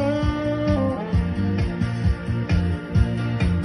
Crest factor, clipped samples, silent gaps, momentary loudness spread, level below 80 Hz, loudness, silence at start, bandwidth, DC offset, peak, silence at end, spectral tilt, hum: 14 dB; under 0.1%; none; 2 LU; -28 dBFS; -23 LUFS; 0 s; 11.5 kHz; under 0.1%; -8 dBFS; 0 s; -8.5 dB/octave; none